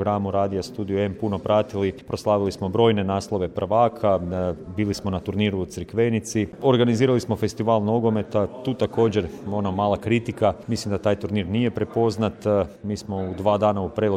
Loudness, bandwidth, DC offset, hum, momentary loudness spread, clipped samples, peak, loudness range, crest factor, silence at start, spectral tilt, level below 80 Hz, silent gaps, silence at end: -23 LUFS; 15 kHz; under 0.1%; none; 7 LU; under 0.1%; -6 dBFS; 2 LU; 16 dB; 0 s; -6.5 dB/octave; -50 dBFS; none; 0 s